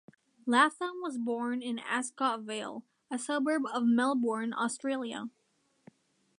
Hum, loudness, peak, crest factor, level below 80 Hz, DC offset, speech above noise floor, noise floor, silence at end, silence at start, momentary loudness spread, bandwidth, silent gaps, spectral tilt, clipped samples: none; -32 LUFS; -10 dBFS; 22 dB; -86 dBFS; under 0.1%; 33 dB; -64 dBFS; 1.1 s; 0.45 s; 14 LU; 11 kHz; none; -3.5 dB/octave; under 0.1%